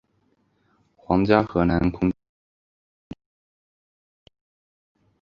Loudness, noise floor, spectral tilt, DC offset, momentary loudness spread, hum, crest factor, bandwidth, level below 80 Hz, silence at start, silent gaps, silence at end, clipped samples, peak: -22 LUFS; -67 dBFS; -9.5 dB/octave; under 0.1%; 25 LU; none; 24 dB; 6.6 kHz; -44 dBFS; 1.1 s; none; 3.1 s; under 0.1%; -2 dBFS